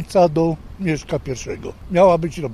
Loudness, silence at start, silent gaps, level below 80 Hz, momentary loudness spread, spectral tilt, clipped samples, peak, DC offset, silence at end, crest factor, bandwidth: -19 LUFS; 0 s; none; -40 dBFS; 13 LU; -6.5 dB/octave; under 0.1%; -2 dBFS; under 0.1%; 0 s; 16 dB; 13 kHz